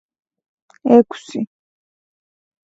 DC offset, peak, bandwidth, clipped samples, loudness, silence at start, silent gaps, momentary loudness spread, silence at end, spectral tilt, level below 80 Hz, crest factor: under 0.1%; 0 dBFS; 8 kHz; under 0.1%; -17 LUFS; 0.85 s; none; 14 LU; 1.25 s; -7 dB/octave; -68 dBFS; 20 dB